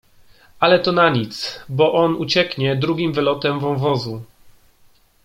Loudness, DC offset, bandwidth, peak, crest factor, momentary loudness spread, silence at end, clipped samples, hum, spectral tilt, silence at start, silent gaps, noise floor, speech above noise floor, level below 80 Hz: -18 LUFS; under 0.1%; 15.5 kHz; -2 dBFS; 18 dB; 10 LU; 0.75 s; under 0.1%; none; -6 dB/octave; 0.6 s; none; -53 dBFS; 35 dB; -56 dBFS